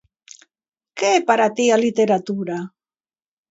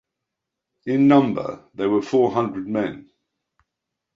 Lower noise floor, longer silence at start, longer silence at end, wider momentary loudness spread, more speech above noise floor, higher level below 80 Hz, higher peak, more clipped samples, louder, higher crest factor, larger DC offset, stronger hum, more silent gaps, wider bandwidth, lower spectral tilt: first, under -90 dBFS vs -83 dBFS; about the same, 0.95 s vs 0.85 s; second, 0.85 s vs 1.15 s; about the same, 13 LU vs 15 LU; first, over 72 dB vs 63 dB; second, -70 dBFS vs -62 dBFS; about the same, -2 dBFS vs -2 dBFS; neither; about the same, -19 LUFS vs -20 LUFS; about the same, 20 dB vs 20 dB; neither; neither; neither; about the same, 8 kHz vs 7.4 kHz; second, -4 dB/octave vs -8 dB/octave